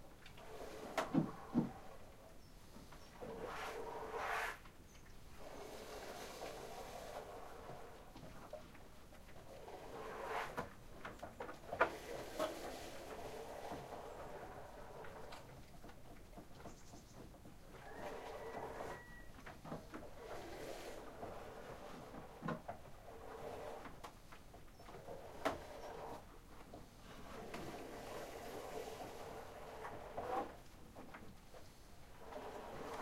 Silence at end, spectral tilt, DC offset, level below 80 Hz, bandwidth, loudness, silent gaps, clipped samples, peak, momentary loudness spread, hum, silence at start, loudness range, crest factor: 0 s; -5 dB/octave; under 0.1%; -62 dBFS; 16 kHz; -49 LUFS; none; under 0.1%; -18 dBFS; 15 LU; none; 0 s; 8 LU; 30 dB